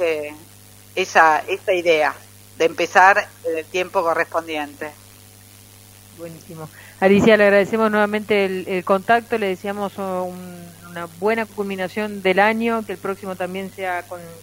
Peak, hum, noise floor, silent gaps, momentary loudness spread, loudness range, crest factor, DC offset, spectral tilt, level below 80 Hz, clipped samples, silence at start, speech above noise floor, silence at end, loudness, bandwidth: 0 dBFS; 50 Hz at -45 dBFS; -45 dBFS; none; 22 LU; 7 LU; 20 dB; under 0.1%; -5 dB/octave; -60 dBFS; under 0.1%; 0 s; 26 dB; 0 s; -19 LUFS; 16 kHz